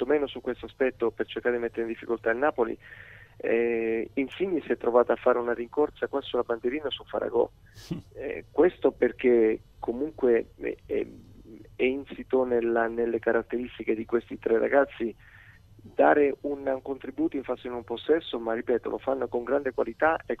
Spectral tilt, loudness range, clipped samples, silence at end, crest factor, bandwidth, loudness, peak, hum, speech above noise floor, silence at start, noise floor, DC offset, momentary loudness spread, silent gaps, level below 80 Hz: -7 dB/octave; 3 LU; under 0.1%; 0.05 s; 20 dB; 6.6 kHz; -28 LUFS; -6 dBFS; none; 25 dB; 0 s; -52 dBFS; under 0.1%; 11 LU; none; -58 dBFS